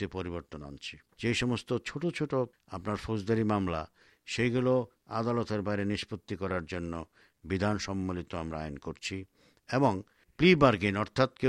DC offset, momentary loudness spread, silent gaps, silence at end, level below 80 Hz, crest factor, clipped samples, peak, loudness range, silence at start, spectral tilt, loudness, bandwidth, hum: under 0.1%; 14 LU; none; 0 s; -54 dBFS; 22 dB; under 0.1%; -10 dBFS; 6 LU; 0 s; -6 dB/octave; -31 LUFS; 12 kHz; none